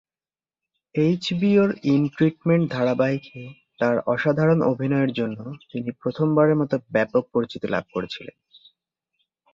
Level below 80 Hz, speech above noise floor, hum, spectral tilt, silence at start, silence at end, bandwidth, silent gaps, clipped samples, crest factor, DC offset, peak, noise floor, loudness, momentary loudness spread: -62 dBFS; over 68 dB; none; -8 dB/octave; 0.95 s; 1.25 s; 7.6 kHz; none; under 0.1%; 18 dB; under 0.1%; -6 dBFS; under -90 dBFS; -22 LUFS; 13 LU